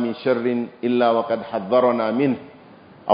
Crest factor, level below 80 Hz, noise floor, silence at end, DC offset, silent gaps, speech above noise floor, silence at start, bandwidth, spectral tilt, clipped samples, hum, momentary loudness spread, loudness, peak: 20 dB; -66 dBFS; -46 dBFS; 0 s; under 0.1%; none; 26 dB; 0 s; 5.2 kHz; -11 dB/octave; under 0.1%; none; 7 LU; -21 LUFS; -2 dBFS